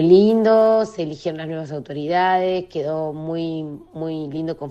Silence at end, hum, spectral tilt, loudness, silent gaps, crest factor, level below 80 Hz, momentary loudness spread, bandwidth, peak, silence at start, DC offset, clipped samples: 0 s; none; -7.5 dB/octave; -20 LUFS; none; 18 dB; -58 dBFS; 14 LU; 8.2 kHz; -2 dBFS; 0 s; under 0.1%; under 0.1%